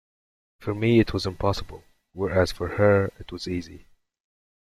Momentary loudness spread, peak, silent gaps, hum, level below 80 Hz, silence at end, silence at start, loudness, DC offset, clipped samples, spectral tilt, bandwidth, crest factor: 15 LU; -6 dBFS; none; none; -46 dBFS; 0.9 s; 0.6 s; -24 LUFS; under 0.1%; under 0.1%; -7 dB/octave; 14 kHz; 20 dB